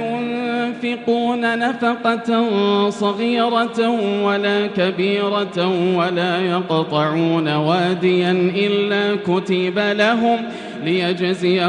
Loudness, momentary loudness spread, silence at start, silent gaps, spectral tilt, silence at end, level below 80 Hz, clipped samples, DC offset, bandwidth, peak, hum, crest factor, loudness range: -18 LUFS; 4 LU; 0 s; none; -6.5 dB/octave; 0 s; -66 dBFS; under 0.1%; under 0.1%; 10 kHz; -4 dBFS; none; 14 dB; 1 LU